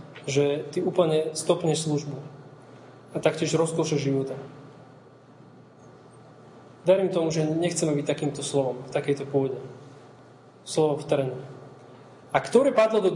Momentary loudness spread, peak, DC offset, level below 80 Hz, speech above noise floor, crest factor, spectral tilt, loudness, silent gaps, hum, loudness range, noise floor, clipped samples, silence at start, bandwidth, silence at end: 19 LU; -6 dBFS; under 0.1%; -70 dBFS; 26 dB; 20 dB; -5.5 dB/octave; -25 LUFS; none; none; 4 LU; -51 dBFS; under 0.1%; 0 s; 11.5 kHz; 0 s